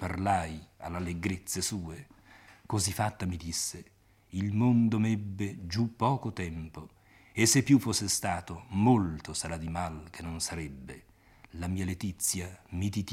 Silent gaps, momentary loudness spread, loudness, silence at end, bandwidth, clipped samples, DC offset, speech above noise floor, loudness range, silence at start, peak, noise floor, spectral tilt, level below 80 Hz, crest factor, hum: none; 17 LU; -31 LUFS; 0 s; 16.5 kHz; under 0.1%; under 0.1%; 26 dB; 7 LU; 0 s; -12 dBFS; -56 dBFS; -4.5 dB/octave; -56 dBFS; 20 dB; none